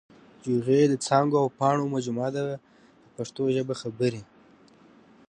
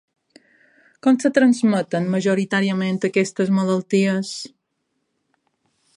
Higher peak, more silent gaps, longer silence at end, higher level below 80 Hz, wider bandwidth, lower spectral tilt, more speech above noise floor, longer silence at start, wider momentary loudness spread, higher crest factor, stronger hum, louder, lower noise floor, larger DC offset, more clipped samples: second, -6 dBFS vs -2 dBFS; neither; second, 1.05 s vs 1.5 s; about the same, -70 dBFS vs -70 dBFS; about the same, 10.5 kHz vs 11 kHz; about the same, -6 dB/octave vs -6 dB/octave; second, 31 dB vs 55 dB; second, 0.45 s vs 1.05 s; first, 15 LU vs 7 LU; about the same, 20 dB vs 18 dB; neither; second, -26 LUFS vs -19 LUFS; second, -56 dBFS vs -74 dBFS; neither; neither